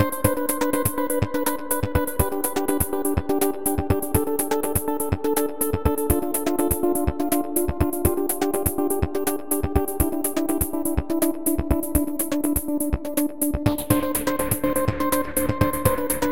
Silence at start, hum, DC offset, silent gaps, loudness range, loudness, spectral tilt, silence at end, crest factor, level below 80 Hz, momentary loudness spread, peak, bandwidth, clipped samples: 0 s; none; 2%; none; 1 LU; -23 LUFS; -5.5 dB/octave; 0 s; 22 dB; -34 dBFS; 3 LU; -2 dBFS; 17 kHz; under 0.1%